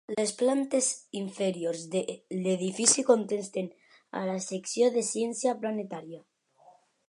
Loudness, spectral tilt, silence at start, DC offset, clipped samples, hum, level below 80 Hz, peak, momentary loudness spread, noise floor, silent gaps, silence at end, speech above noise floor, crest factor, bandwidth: -29 LUFS; -3.5 dB/octave; 0.1 s; under 0.1%; under 0.1%; none; -82 dBFS; -8 dBFS; 14 LU; -60 dBFS; none; 0.9 s; 31 dB; 22 dB; 11.5 kHz